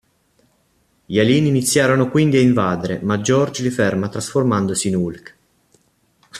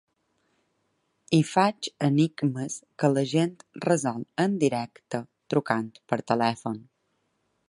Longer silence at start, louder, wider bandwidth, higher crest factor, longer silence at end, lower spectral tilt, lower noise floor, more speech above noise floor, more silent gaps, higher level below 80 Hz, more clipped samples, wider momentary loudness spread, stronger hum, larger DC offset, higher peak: second, 1.1 s vs 1.3 s; first, -17 LUFS vs -27 LUFS; first, 14 kHz vs 11.5 kHz; second, 16 dB vs 22 dB; second, 0 s vs 0.85 s; about the same, -5.5 dB/octave vs -6 dB/octave; second, -62 dBFS vs -74 dBFS; about the same, 45 dB vs 48 dB; neither; first, -54 dBFS vs -72 dBFS; neither; second, 8 LU vs 11 LU; neither; neither; first, -2 dBFS vs -6 dBFS